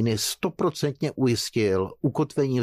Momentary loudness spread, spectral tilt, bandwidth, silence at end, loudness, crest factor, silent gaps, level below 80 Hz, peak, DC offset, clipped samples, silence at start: 3 LU; -5.5 dB/octave; 15.5 kHz; 0 s; -25 LUFS; 12 dB; none; -58 dBFS; -12 dBFS; under 0.1%; under 0.1%; 0 s